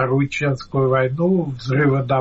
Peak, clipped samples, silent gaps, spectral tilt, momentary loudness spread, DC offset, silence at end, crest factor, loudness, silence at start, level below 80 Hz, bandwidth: -8 dBFS; under 0.1%; none; -8 dB/octave; 4 LU; under 0.1%; 0 s; 10 dB; -19 LUFS; 0 s; -48 dBFS; 7.8 kHz